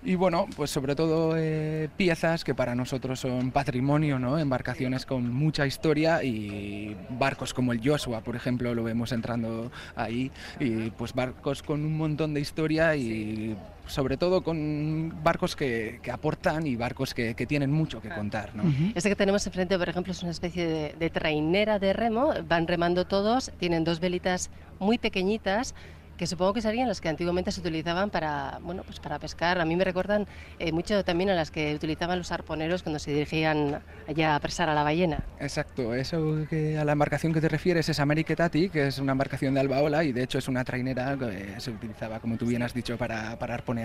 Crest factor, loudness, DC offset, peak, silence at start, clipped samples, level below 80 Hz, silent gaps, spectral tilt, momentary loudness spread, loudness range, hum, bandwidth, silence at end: 18 dB; -28 LUFS; under 0.1%; -10 dBFS; 0 s; under 0.1%; -48 dBFS; none; -6 dB/octave; 8 LU; 3 LU; none; 15.5 kHz; 0 s